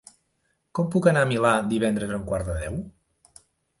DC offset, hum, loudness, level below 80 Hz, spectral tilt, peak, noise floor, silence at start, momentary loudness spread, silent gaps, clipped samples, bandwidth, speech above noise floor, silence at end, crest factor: under 0.1%; none; -24 LUFS; -44 dBFS; -6 dB/octave; -6 dBFS; -72 dBFS; 0.75 s; 13 LU; none; under 0.1%; 11.5 kHz; 49 dB; 0.9 s; 20 dB